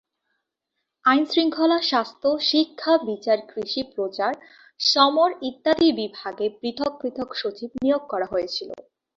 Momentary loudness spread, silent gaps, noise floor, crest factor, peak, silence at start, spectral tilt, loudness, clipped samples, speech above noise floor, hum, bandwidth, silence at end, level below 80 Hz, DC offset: 10 LU; none; -80 dBFS; 20 dB; -4 dBFS; 1.05 s; -3.5 dB/octave; -23 LUFS; under 0.1%; 58 dB; none; 7.6 kHz; 0.35 s; -64 dBFS; under 0.1%